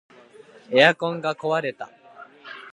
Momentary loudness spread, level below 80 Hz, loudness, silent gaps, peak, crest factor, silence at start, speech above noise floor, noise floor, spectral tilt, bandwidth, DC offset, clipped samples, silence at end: 23 LU; -76 dBFS; -21 LUFS; none; 0 dBFS; 24 dB; 0.7 s; 28 dB; -49 dBFS; -5 dB/octave; 10.5 kHz; under 0.1%; under 0.1%; 0.05 s